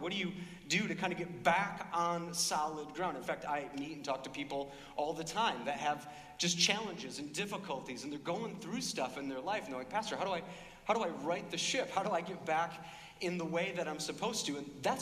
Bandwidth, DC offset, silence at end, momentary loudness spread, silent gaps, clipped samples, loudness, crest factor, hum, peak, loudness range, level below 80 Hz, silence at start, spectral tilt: 15.5 kHz; under 0.1%; 0 s; 9 LU; none; under 0.1%; -37 LUFS; 22 dB; none; -16 dBFS; 4 LU; -70 dBFS; 0 s; -3 dB/octave